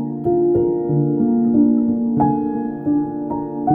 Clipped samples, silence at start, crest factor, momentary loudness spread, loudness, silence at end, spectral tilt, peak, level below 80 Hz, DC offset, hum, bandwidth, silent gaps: under 0.1%; 0 s; 12 dB; 8 LU; -18 LUFS; 0 s; -14 dB/octave; -4 dBFS; -48 dBFS; under 0.1%; none; 2 kHz; none